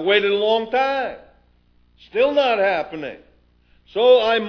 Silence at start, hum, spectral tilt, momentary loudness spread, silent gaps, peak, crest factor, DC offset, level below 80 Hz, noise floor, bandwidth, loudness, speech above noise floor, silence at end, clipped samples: 0 s; 60 Hz at -55 dBFS; -5 dB/octave; 15 LU; none; -2 dBFS; 18 dB; under 0.1%; -58 dBFS; -57 dBFS; 5.4 kHz; -19 LUFS; 39 dB; 0 s; under 0.1%